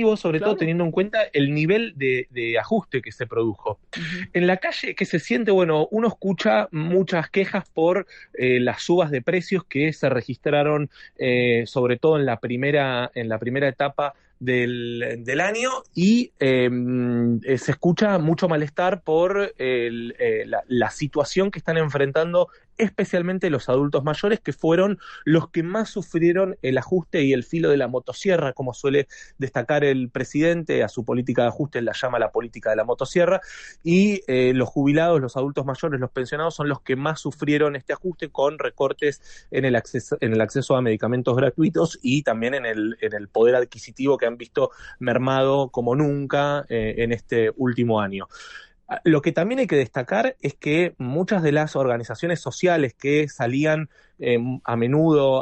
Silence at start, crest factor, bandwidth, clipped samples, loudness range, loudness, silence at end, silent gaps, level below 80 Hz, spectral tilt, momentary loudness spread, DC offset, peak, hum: 0 s; 16 dB; 8.8 kHz; under 0.1%; 2 LU; -22 LUFS; 0 s; none; -54 dBFS; -6.5 dB/octave; 7 LU; under 0.1%; -6 dBFS; none